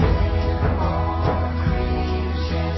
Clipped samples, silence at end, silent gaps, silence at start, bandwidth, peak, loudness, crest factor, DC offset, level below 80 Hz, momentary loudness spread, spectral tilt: under 0.1%; 0 s; none; 0 s; 6 kHz; -8 dBFS; -22 LUFS; 12 dB; under 0.1%; -24 dBFS; 3 LU; -8.5 dB/octave